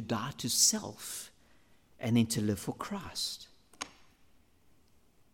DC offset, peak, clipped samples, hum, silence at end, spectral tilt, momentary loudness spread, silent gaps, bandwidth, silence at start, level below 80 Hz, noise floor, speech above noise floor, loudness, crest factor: under 0.1%; -12 dBFS; under 0.1%; none; 1.45 s; -3 dB/octave; 19 LU; none; 17 kHz; 0 s; -68 dBFS; -67 dBFS; 35 dB; -31 LUFS; 22 dB